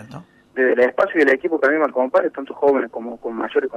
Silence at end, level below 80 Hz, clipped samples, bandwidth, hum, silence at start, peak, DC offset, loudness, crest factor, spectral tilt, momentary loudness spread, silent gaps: 0 s; -64 dBFS; under 0.1%; 8.6 kHz; none; 0 s; -4 dBFS; under 0.1%; -19 LUFS; 14 dB; -6 dB/octave; 12 LU; none